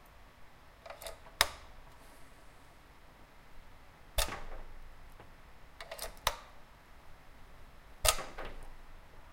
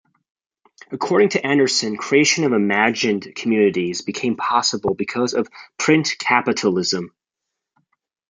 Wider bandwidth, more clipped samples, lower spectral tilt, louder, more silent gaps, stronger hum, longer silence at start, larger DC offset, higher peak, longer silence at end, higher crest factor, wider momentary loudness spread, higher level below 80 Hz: first, 16.5 kHz vs 9.6 kHz; neither; second, -1 dB/octave vs -3.5 dB/octave; second, -36 LUFS vs -19 LUFS; neither; neither; second, 0 s vs 0.9 s; neither; about the same, -4 dBFS vs -2 dBFS; second, 0 s vs 1.2 s; first, 38 dB vs 18 dB; first, 27 LU vs 8 LU; first, -48 dBFS vs -64 dBFS